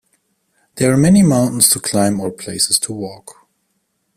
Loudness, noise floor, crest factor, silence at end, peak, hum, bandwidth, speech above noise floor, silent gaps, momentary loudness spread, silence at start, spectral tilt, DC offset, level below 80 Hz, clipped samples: -14 LUFS; -68 dBFS; 16 dB; 0.85 s; 0 dBFS; none; 15.5 kHz; 53 dB; none; 13 LU; 0.75 s; -4.5 dB/octave; under 0.1%; -48 dBFS; under 0.1%